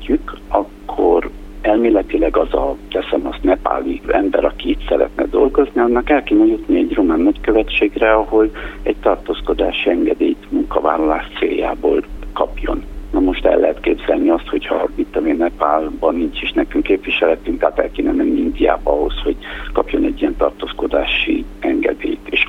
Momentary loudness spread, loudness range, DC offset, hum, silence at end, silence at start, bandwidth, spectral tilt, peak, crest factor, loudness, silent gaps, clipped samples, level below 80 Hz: 7 LU; 3 LU; under 0.1%; 50 Hz at -50 dBFS; 0 s; 0 s; 5.2 kHz; -7 dB/octave; 0 dBFS; 16 dB; -17 LUFS; none; under 0.1%; -30 dBFS